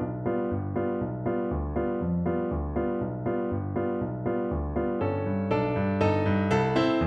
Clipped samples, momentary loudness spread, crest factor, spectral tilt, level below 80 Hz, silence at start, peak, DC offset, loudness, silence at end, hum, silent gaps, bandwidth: under 0.1%; 6 LU; 16 dB; -8.5 dB/octave; -42 dBFS; 0 s; -12 dBFS; under 0.1%; -28 LUFS; 0 s; none; none; 8.6 kHz